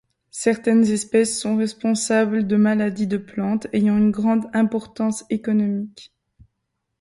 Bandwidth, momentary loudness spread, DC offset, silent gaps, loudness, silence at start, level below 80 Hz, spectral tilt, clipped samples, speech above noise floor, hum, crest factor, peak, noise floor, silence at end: 11.5 kHz; 7 LU; under 0.1%; none; -20 LUFS; 0.35 s; -58 dBFS; -5.5 dB/octave; under 0.1%; 57 dB; none; 14 dB; -6 dBFS; -77 dBFS; 0.95 s